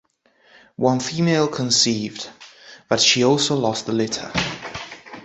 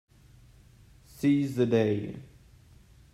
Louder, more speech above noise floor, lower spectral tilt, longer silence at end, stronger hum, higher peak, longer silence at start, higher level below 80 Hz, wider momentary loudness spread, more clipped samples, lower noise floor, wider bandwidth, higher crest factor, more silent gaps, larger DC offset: first, -19 LUFS vs -27 LUFS; first, 38 dB vs 30 dB; second, -3.5 dB/octave vs -7.5 dB/octave; second, 0 s vs 0.9 s; neither; first, -2 dBFS vs -12 dBFS; second, 0.8 s vs 1.15 s; first, -54 dBFS vs -60 dBFS; first, 17 LU vs 14 LU; neither; about the same, -58 dBFS vs -56 dBFS; second, 8.4 kHz vs 14.5 kHz; about the same, 20 dB vs 18 dB; neither; neither